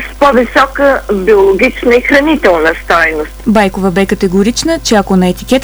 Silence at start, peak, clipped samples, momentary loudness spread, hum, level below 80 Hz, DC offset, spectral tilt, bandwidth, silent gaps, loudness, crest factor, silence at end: 0 s; 0 dBFS; under 0.1%; 4 LU; 50 Hz at -30 dBFS; -28 dBFS; under 0.1%; -5 dB/octave; over 20 kHz; none; -9 LUFS; 10 dB; 0 s